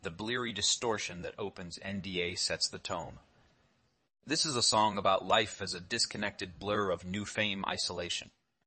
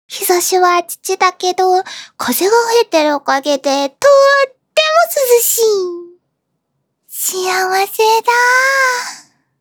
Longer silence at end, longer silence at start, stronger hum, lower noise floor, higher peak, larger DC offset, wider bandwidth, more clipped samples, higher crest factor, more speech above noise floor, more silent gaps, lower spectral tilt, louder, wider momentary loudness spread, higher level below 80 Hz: about the same, 0.35 s vs 0.4 s; about the same, 0.05 s vs 0.1 s; neither; first, -73 dBFS vs -69 dBFS; second, -12 dBFS vs 0 dBFS; neither; second, 8.8 kHz vs over 20 kHz; neither; first, 22 dB vs 14 dB; second, 39 dB vs 57 dB; neither; first, -2.5 dB/octave vs 0 dB/octave; second, -32 LUFS vs -12 LUFS; first, 13 LU vs 9 LU; about the same, -66 dBFS vs -70 dBFS